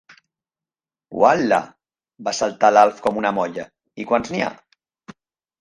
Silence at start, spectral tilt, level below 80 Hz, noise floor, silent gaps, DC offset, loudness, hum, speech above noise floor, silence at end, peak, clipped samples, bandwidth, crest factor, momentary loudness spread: 1.1 s; -4.5 dB/octave; -60 dBFS; under -90 dBFS; none; under 0.1%; -19 LUFS; none; over 72 dB; 0.5 s; 0 dBFS; under 0.1%; 11 kHz; 20 dB; 19 LU